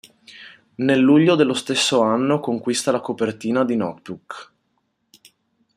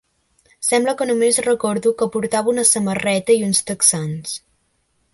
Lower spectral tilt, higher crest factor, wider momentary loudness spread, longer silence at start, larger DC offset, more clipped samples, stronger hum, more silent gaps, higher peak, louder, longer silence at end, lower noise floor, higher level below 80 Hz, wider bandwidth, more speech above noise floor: first, -4.5 dB/octave vs -3 dB/octave; about the same, 16 dB vs 18 dB; first, 22 LU vs 9 LU; second, 0.35 s vs 0.6 s; neither; neither; neither; neither; second, -4 dBFS vs 0 dBFS; about the same, -19 LUFS vs -17 LUFS; first, 1.35 s vs 0.75 s; first, -70 dBFS vs -66 dBFS; second, -66 dBFS vs -58 dBFS; first, 14 kHz vs 12 kHz; about the same, 51 dB vs 48 dB